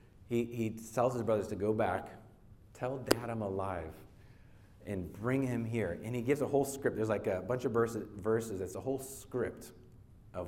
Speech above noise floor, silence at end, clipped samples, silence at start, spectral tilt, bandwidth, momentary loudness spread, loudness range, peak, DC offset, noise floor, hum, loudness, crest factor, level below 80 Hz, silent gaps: 23 dB; 0 s; under 0.1%; 0.05 s; -6 dB/octave; 16.5 kHz; 10 LU; 4 LU; -6 dBFS; under 0.1%; -58 dBFS; none; -35 LUFS; 28 dB; -60 dBFS; none